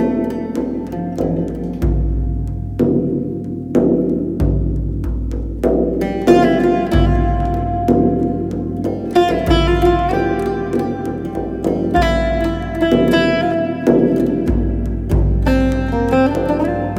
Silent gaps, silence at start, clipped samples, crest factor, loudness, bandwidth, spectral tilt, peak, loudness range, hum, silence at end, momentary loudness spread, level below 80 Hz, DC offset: none; 0 s; under 0.1%; 16 dB; -17 LUFS; 14.5 kHz; -8 dB/octave; 0 dBFS; 3 LU; none; 0 s; 8 LU; -24 dBFS; under 0.1%